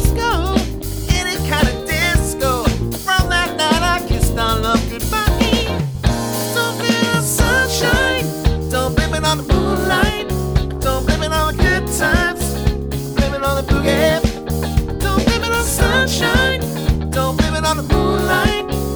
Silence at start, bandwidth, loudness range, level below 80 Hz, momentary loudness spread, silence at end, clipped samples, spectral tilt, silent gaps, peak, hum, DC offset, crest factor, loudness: 0 s; over 20 kHz; 1 LU; -22 dBFS; 5 LU; 0 s; under 0.1%; -4.5 dB/octave; none; 0 dBFS; none; under 0.1%; 16 dB; -17 LUFS